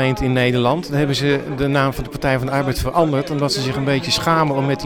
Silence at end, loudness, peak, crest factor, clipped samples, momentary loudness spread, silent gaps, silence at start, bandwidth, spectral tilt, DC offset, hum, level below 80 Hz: 0 s; -18 LUFS; -4 dBFS; 14 dB; under 0.1%; 3 LU; none; 0 s; 18.5 kHz; -5.5 dB/octave; under 0.1%; none; -36 dBFS